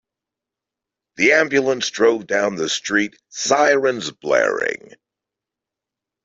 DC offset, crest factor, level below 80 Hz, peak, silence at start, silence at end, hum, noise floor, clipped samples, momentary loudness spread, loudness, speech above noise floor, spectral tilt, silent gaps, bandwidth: under 0.1%; 18 dB; -64 dBFS; -2 dBFS; 1.2 s; 1.5 s; none; -86 dBFS; under 0.1%; 10 LU; -18 LUFS; 67 dB; -2.5 dB/octave; none; 7.8 kHz